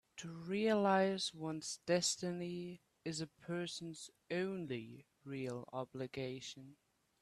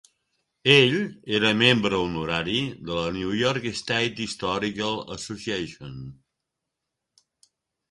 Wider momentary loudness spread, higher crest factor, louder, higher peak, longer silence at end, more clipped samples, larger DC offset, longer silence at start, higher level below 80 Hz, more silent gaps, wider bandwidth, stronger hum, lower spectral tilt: about the same, 16 LU vs 15 LU; about the same, 20 dB vs 22 dB; second, -40 LUFS vs -23 LUFS; second, -22 dBFS vs -4 dBFS; second, 0.5 s vs 1.8 s; neither; neither; second, 0.15 s vs 0.65 s; second, -78 dBFS vs -54 dBFS; neither; first, 13 kHz vs 11.5 kHz; neither; about the same, -4 dB/octave vs -4.5 dB/octave